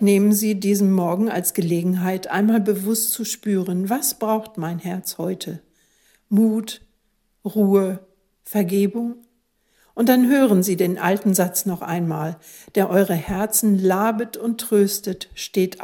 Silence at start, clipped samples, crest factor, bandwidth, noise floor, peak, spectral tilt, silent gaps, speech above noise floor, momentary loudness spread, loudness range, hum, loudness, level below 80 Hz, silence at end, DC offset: 0 s; under 0.1%; 18 dB; 17.5 kHz; -67 dBFS; -2 dBFS; -5.5 dB/octave; none; 47 dB; 12 LU; 4 LU; none; -20 LUFS; -56 dBFS; 0 s; under 0.1%